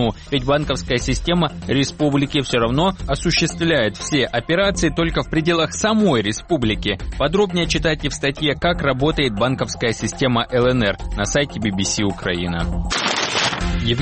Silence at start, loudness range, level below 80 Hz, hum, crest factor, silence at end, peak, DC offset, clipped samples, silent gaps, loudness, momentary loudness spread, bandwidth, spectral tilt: 0 s; 1 LU; -32 dBFS; none; 14 dB; 0 s; -4 dBFS; 0.2%; under 0.1%; none; -19 LUFS; 4 LU; 8.8 kHz; -4.5 dB/octave